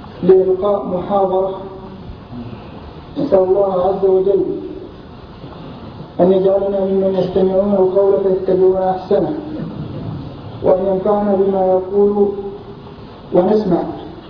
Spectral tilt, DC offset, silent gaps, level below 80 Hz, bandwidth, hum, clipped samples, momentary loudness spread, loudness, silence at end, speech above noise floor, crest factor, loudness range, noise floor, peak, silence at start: -10.5 dB/octave; under 0.1%; none; -42 dBFS; 5.4 kHz; none; under 0.1%; 20 LU; -15 LUFS; 0 s; 21 dB; 16 dB; 3 LU; -35 dBFS; 0 dBFS; 0 s